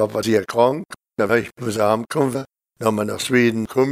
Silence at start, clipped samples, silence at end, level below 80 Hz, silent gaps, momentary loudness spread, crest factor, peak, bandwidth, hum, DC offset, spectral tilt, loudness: 0 s; under 0.1%; 0 s; -58 dBFS; none; 10 LU; 18 dB; -2 dBFS; 16 kHz; none; under 0.1%; -5.5 dB/octave; -20 LUFS